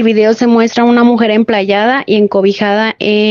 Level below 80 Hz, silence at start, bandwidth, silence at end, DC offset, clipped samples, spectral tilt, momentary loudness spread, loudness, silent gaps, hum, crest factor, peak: -54 dBFS; 0 s; 7 kHz; 0 s; under 0.1%; under 0.1%; -6 dB/octave; 3 LU; -10 LUFS; none; none; 10 dB; 0 dBFS